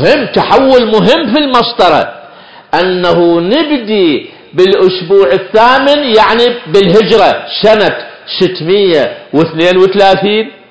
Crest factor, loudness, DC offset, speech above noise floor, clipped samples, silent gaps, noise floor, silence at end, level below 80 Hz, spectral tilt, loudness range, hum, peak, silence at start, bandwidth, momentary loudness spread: 8 dB; -8 LUFS; 1%; 26 dB; 3%; none; -34 dBFS; 0.2 s; -42 dBFS; -6 dB/octave; 3 LU; none; 0 dBFS; 0 s; 8 kHz; 6 LU